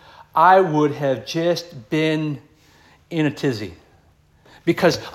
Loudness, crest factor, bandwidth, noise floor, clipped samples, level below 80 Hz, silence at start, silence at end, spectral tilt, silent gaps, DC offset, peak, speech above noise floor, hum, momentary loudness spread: -20 LUFS; 20 dB; 16 kHz; -55 dBFS; under 0.1%; -58 dBFS; 0.2 s; 0.05 s; -6 dB/octave; none; under 0.1%; -2 dBFS; 37 dB; none; 15 LU